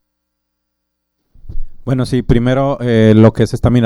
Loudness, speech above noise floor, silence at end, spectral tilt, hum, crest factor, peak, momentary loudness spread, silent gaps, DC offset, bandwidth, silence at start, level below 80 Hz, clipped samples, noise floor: -12 LUFS; 61 dB; 0 s; -8 dB/octave; 60 Hz at -35 dBFS; 14 dB; 0 dBFS; 18 LU; none; under 0.1%; 12 kHz; 1.45 s; -28 dBFS; 0.1%; -72 dBFS